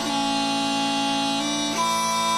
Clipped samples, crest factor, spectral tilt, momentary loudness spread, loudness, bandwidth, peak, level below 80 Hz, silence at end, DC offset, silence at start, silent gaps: under 0.1%; 12 dB; -2 dB/octave; 1 LU; -23 LUFS; 16 kHz; -12 dBFS; -58 dBFS; 0 s; under 0.1%; 0 s; none